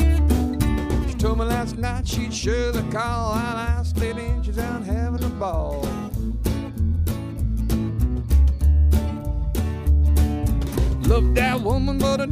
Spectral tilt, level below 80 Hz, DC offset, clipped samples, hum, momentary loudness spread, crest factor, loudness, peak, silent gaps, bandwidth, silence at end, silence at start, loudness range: -6.5 dB/octave; -22 dBFS; under 0.1%; under 0.1%; none; 7 LU; 16 dB; -23 LUFS; -4 dBFS; none; 16 kHz; 0 s; 0 s; 5 LU